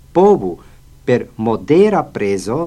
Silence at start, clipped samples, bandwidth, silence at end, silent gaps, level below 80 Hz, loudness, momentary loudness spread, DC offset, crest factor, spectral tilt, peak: 0.15 s; under 0.1%; 12 kHz; 0 s; none; -44 dBFS; -15 LUFS; 13 LU; under 0.1%; 14 dB; -7 dB/octave; 0 dBFS